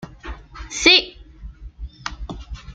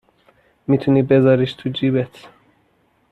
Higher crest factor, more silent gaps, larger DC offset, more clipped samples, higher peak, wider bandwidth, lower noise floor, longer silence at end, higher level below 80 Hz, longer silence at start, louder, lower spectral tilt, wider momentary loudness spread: first, 22 dB vs 16 dB; neither; neither; neither; about the same, -2 dBFS vs -4 dBFS; first, 13 kHz vs 5.6 kHz; second, -39 dBFS vs -61 dBFS; second, 0 s vs 1.05 s; first, -38 dBFS vs -56 dBFS; second, 0 s vs 0.7 s; first, -14 LUFS vs -17 LUFS; second, -2 dB/octave vs -9 dB/octave; first, 25 LU vs 11 LU